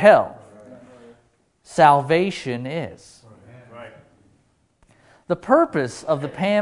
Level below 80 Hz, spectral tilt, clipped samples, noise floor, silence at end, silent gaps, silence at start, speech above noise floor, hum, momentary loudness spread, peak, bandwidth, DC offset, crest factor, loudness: -60 dBFS; -6 dB/octave; under 0.1%; -62 dBFS; 0 s; none; 0 s; 44 dB; none; 19 LU; 0 dBFS; 11 kHz; under 0.1%; 22 dB; -20 LUFS